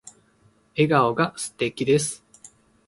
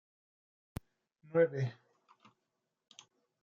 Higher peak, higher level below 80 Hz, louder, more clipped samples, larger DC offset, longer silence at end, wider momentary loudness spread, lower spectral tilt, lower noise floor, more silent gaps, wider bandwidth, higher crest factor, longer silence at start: first, -6 dBFS vs -18 dBFS; about the same, -62 dBFS vs -66 dBFS; first, -23 LUFS vs -34 LUFS; neither; neither; second, 0.7 s vs 1.7 s; second, 12 LU vs 27 LU; second, -5 dB/octave vs -7 dB/octave; second, -61 dBFS vs -86 dBFS; neither; first, 11.5 kHz vs 7.4 kHz; about the same, 20 dB vs 22 dB; second, 0.75 s vs 1.35 s